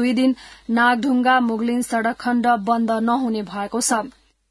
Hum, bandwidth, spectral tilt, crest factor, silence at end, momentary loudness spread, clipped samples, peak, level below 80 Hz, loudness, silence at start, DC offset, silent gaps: none; 12 kHz; -3.5 dB/octave; 16 dB; 0.4 s; 7 LU; under 0.1%; -4 dBFS; -58 dBFS; -20 LUFS; 0 s; under 0.1%; none